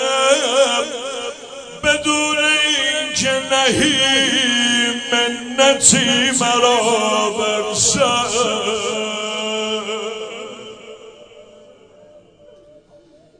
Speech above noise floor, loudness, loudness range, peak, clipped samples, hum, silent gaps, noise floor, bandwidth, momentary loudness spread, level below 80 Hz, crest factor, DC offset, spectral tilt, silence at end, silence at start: 33 dB; -15 LUFS; 12 LU; 0 dBFS; under 0.1%; none; none; -49 dBFS; 10 kHz; 14 LU; -52 dBFS; 18 dB; under 0.1%; -1.5 dB/octave; 1.2 s; 0 s